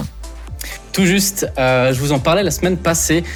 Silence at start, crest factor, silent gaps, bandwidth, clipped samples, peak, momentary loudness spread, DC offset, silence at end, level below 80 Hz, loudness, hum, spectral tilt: 0 s; 12 dB; none; 20 kHz; under 0.1%; -4 dBFS; 16 LU; under 0.1%; 0 s; -32 dBFS; -15 LUFS; none; -4 dB/octave